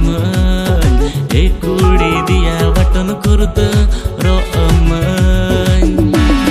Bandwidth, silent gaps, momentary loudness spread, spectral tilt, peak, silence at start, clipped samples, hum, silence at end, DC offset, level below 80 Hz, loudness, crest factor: 15 kHz; none; 3 LU; -6.5 dB/octave; 0 dBFS; 0 s; under 0.1%; none; 0 s; under 0.1%; -14 dBFS; -13 LUFS; 10 dB